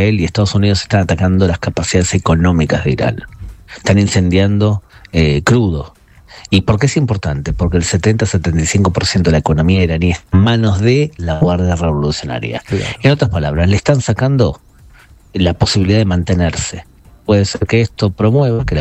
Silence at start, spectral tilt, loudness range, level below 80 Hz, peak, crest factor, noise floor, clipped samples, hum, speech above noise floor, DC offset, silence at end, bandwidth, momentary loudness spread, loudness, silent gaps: 0 s; -6 dB/octave; 2 LU; -28 dBFS; 0 dBFS; 12 dB; -42 dBFS; under 0.1%; none; 29 dB; under 0.1%; 0 s; 10.5 kHz; 8 LU; -14 LUFS; none